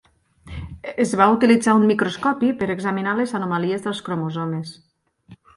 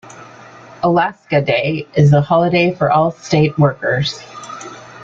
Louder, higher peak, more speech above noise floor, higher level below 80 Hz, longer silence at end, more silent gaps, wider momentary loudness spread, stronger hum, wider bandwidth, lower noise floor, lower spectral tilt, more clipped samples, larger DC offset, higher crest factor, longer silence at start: second, -20 LUFS vs -15 LUFS; about the same, 0 dBFS vs -2 dBFS; first, 30 dB vs 24 dB; about the same, -48 dBFS vs -50 dBFS; first, 0.2 s vs 0 s; neither; about the same, 17 LU vs 18 LU; neither; first, 11.5 kHz vs 7.6 kHz; first, -49 dBFS vs -39 dBFS; about the same, -6 dB/octave vs -6.5 dB/octave; neither; neither; first, 20 dB vs 14 dB; first, 0.45 s vs 0.05 s